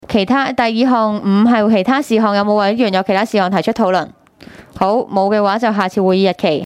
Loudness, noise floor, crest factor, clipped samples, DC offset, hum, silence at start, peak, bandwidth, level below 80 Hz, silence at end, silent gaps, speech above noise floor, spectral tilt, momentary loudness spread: -14 LUFS; -40 dBFS; 12 dB; under 0.1%; under 0.1%; none; 0.1 s; -2 dBFS; 13 kHz; -52 dBFS; 0 s; none; 26 dB; -6.5 dB/octave; 3 LU